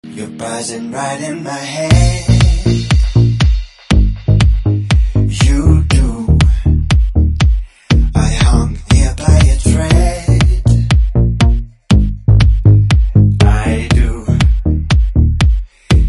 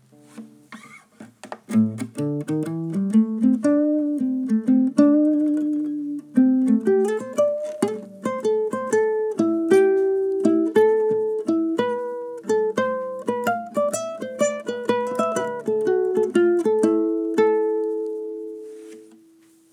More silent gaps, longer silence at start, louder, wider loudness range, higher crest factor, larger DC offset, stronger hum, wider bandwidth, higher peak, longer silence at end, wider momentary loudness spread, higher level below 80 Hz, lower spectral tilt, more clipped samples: neither; second, 0.05 s vs 0.35 s; first, -13 LUFS vs -21 LUFS; about the same, 2 LU vs 4 LU; second, 10 dB vs 18 dB; neither; neither; second, 11.5 kHz vs 14 kHz; first, 0 dBFS vs -4 dBFS; second, 0 s vs 0.7 s; about the same, 10 LU vs 11 LU; first, -14 dBFS vs -80 dBFS; about the same, -6 dB/octave vs -6.5 dB/octave; neither